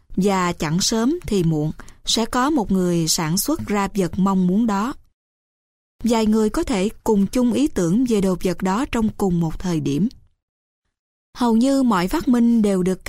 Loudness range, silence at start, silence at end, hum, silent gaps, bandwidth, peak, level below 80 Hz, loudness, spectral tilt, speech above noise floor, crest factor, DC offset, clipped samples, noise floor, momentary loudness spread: 2 LU; 0.1 s; 0.1 s; none; 5.14-5.99 s, 10.42-10.82 s, 10.99-11.33 s; 16 kHz; -6 dBFS; -40 dBFS; -20 LUFS; -5.5 dB/octave; over 71 dB; 12 dB; under 0.1%; under 0.1%; under -90 dBFS; 6 LU